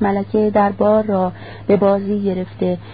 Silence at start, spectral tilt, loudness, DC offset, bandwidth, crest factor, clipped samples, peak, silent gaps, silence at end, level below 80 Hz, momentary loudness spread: 0 s; -13 dB/octave; -17 LUFS; 0.5%; 4.9 kHz; 14 dB; under 0.1%; -2 dBFS; none; 0 s; -46 dBFS; 7 LU